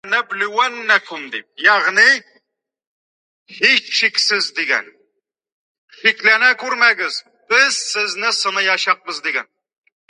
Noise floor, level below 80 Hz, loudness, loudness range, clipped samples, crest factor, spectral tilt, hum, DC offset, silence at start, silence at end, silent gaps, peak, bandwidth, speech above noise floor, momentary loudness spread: -74 dBFS; -80 dBFS; -15 LUFS; 3 LU; under 0.1%; 18 dB; 0.5 dB/octave; none; under 0.1%; 0.05 s; 0.65 s; 2.87-3.46 s, 5.52-5.88 s; 0 dBFS; 11.5 kHz; 57 dB; 9 LU